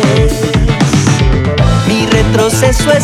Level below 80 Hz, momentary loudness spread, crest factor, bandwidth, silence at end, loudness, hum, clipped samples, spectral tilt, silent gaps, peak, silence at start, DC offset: -18 dBFS; 2 LU; 8 dB; 15.5 kHz; 0 s; -10 LUFS; none; under 0.1%; -5.5 dB/octave; none; 0 dBFS; 0 s; under 0.1%